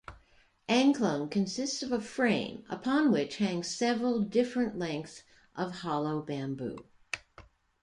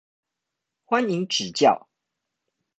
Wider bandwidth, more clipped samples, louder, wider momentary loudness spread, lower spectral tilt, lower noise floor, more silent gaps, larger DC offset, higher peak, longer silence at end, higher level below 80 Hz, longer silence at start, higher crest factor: first, 11 kHz vs 9 kHz; neither; second, -31 LUFS vs -23 LUFS; first, 14 LU vs 6 LU; about the same, -5 dB/octave vs -4 dB/octave; second, -65 dBFS vs -84 dBFS; neither; neither; second, -12 dBFS vs -6 dBFS; second, 0.4 s vs 1 s; first, -66 dBFS vs -72 dBFS; second, 0.1 s vs 0.9 s; about the same, 20 dB vs 20 dB